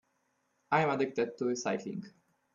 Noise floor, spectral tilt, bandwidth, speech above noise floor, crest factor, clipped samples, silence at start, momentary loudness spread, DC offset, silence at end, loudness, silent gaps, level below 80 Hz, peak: -77 dBFS; -5 dB/octave; 7.4 kHz; 45 dB; 22 dB; under 0.1%; 0.7 s; 11 LU; under 0.1%; 0.45 s; -32 LUFS; none; -78 dBFS; -14 dBFS